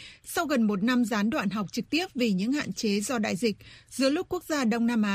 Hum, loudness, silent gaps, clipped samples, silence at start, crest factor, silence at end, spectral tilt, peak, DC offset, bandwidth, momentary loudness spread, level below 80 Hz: none; -27 LUFS; none; under 0.1%; 0 s; 16 dB; 0 s; -4.5 dB/octave; -12 dBFS; under 0.1%; 15.5 kHz; 6 LU; -60 dBFS